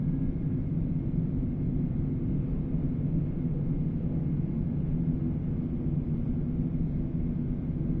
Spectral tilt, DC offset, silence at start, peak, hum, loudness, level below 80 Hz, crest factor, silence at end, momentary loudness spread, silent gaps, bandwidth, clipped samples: -13 dB/octave; under 0.1%; 0 s; -16 dBFS; none; -31 LUFS; -36 dBFS; 12 dB; 0 s; 2 LU; none; 3.2 kHz; under 0.1%